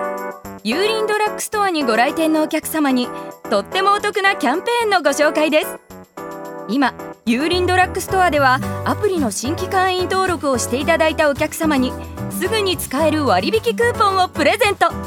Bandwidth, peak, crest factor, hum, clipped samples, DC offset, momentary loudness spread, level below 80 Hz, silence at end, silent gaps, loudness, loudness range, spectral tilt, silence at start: 19.5 kHz; 0 dBFS; 16 dB; none; under 0.1%; under 0.1%; 11 LU; -44 dBFS; 0 s; none; -17 LUFS; 1 LU; -4 dB/octave; 0 s